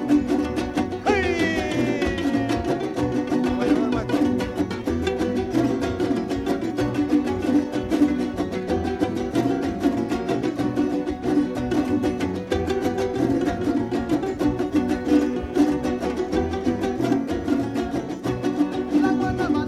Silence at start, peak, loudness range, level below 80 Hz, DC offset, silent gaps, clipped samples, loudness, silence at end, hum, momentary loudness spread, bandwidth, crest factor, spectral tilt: 0 s; -8 dBFS; 1 LU; -42 dBFS; under 0.1%; none; under 0.1%; -23 LUFS; 0 s; none; 4 LU; 13.5 kHz; 16 dB; -6.5 dB/octave